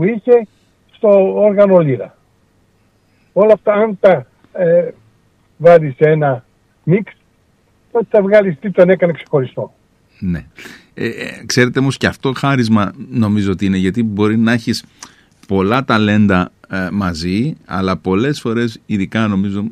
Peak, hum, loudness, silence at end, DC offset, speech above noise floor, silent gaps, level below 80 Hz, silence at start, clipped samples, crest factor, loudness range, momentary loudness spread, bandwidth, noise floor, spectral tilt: 0 dBFS; none; -14 LUFS; 0 s; under 0.1%; 42 dB; none; -48 dBFS; 0 s; under 0.1%; 14 dB; 4 LU; 13 LU; 14 kHz; -55 dBFS; -7 dB/octave